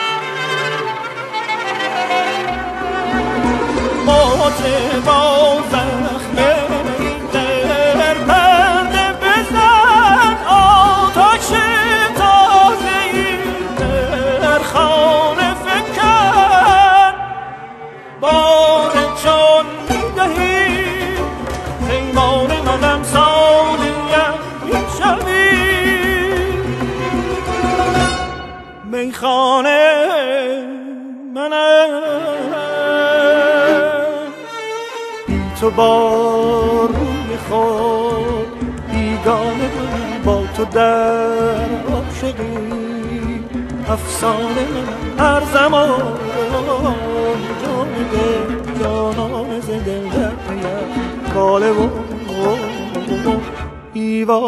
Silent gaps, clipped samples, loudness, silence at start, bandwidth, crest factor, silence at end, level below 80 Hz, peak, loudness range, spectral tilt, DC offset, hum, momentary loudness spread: none; under 0.1%; -14 LUFS; 0 s; 13 kHz; 14 dB; 0 s; -32 dBFS; 0 dBFS; 8 LU; -4.5 dB/octave; under 0.1%; none; 12 LU